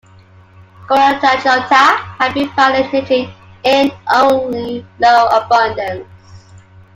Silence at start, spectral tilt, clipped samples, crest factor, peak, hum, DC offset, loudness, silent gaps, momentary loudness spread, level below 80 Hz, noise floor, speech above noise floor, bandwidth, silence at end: 0.8 s; -4 dB/octave; under 0.1%; 14 dB; 0 dBFS; none; under 0.1%; -13 LUFS; none; 12 LU; -52 dBFS; -43 dBFS; 30 dB; 16 kHz; 0.4 s